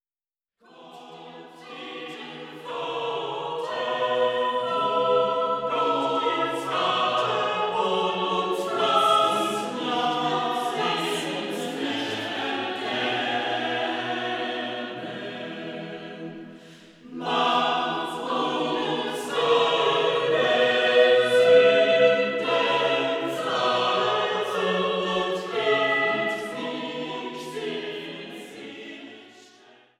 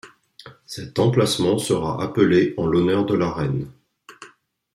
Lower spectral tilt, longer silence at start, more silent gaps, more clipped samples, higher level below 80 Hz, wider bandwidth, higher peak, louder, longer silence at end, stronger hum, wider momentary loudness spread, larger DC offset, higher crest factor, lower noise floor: second, -4 dB/octave vs -6 dB/octave; first, 0.8 s vs 0.05 s; neither; neither; second, -76 dBFS vs -52 dBFS; second, 14 kHz vs 15.5 kHz; about the same, -6 dBFS vs -4 dBFS; second, -24 LUFS vs -20 LUFS; first, 0.7 s vs 0.45 s; neither; first, 17 LU vs 11 LU; neither; about the same, 20 dB vs 18 dB; first, under -90 dBFS vs -53 dBFS